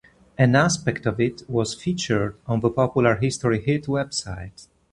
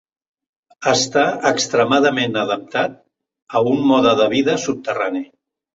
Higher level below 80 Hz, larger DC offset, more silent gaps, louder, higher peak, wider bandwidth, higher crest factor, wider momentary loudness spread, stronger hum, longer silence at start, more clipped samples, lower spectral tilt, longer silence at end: first, -48 dBFS vs -60 dBFS; neither; second, none vs 3.42-3.47 s; second, -22 LUFS vs -17 LUFS; about the same, -2 dBFS vs 0 dBFS; first, 11.5 kHz vs 7.8 kHz; about the same, 20 dB vs 18 dB; about the same, 9 LU vs 9 LU; neither; second, 0.4 s vs 0.8 s; neither; first, -5.5 dB/octave vs -4 dB/octave; second, 0.3 s vs 0.5 s